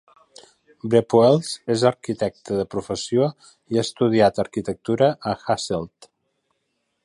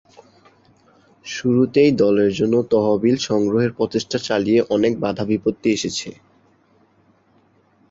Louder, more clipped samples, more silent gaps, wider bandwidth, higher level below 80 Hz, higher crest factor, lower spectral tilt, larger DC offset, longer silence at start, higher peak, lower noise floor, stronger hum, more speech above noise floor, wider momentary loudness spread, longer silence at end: about the same, -21 LUFS vs -19 LUFS; neither; neither; first, 11.5 kHz vs 8 kHz; about the same, -56 dBFS vs -54 dBFS; about the same, 18 dB vs 16 dB; about the same, -6 dB/octave vs -5.5 dB/octave; neither; second, 0.85 s vs 1.25 s; about the same, -4 dBFS vs -4 dBFS; first, -74 dBFS vs -58 dBFS; neither; first, 53 dB vs 40 dB; about the same, 10 LU vs 9 LU; second, 1.15 s vs 1.8 s